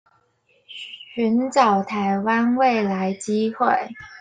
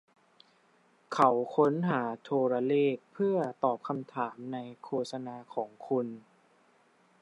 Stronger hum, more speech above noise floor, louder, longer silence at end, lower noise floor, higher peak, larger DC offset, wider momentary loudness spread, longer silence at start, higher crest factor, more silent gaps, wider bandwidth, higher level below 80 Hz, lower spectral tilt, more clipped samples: neither; first, 43 dB vs 36 dB; first, -20 LUFS vs -31 LUFS; second, 0 s vs 1 s; about the same, -63 dBFS vs -66 dBFS; first, -4 dBFS vs -10 dBFS; neither; first, 17 LU vs 13 LU; second, 0.7 s vs 1.1 s; about the same, 18 dB vs 22 dB; neither; second, 9.4 kHz vs 11.5 kHz; first, -66 dBFS vs -86 dBFS; second, -5.5 dB/octave vs -7.5 dB/octave; neither